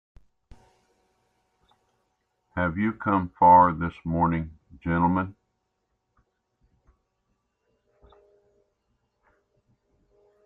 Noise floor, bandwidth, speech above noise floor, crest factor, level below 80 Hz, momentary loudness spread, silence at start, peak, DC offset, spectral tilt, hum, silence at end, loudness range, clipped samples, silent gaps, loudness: -77 dBFS; 4 kHz; 55 dB; 22 dB; -54 dBFS; 20 LU; 2.55 s; -6 dBFS; under 0.1%; -10.5 dB/octave; none; 5.15 s; 9 LU; under 0.1%; none; -23 LUFS